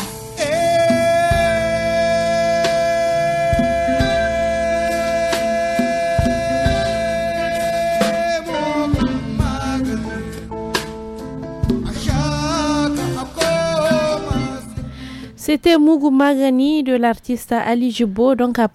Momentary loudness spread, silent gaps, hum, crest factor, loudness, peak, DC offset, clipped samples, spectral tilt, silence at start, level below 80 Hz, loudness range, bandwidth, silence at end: 10 LU; none; none; 14 dB; -18 LUFS; -4 dBFS; under 0.1%; under 0.1%; -5.5 dB/octave; 0 s; -34 dBFS; 5 LU; 14.5 kHz; 0.05 s